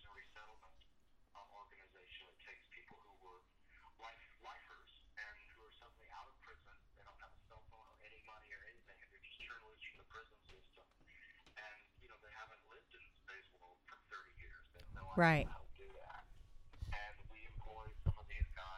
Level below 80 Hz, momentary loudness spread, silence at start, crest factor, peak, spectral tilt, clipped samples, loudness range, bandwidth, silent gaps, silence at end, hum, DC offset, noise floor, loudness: -56 dBFS; 21 LU; 0 s; 28 dB; -20 dBFS; -7 dB/octave; under 0.1%; 20 LU; 11 kHz; none; 0 s; none; under 0.1%; -69 dBFS; -45 LUFS